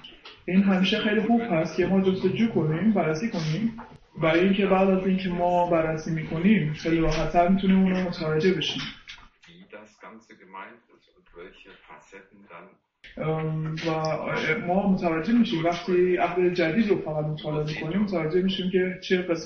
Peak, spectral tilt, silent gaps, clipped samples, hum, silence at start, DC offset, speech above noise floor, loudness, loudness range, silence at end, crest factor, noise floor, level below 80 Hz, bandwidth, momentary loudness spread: -8 dBFS; -7 dB/octave; none; under 0.1%; none; 0.05 s; under 0.1%; 27 dB; -24 LUFS; 9 LU; 0 s; 16 dB; -52 dBFS; -46 dBFS; 6.6 kHz; 10 LU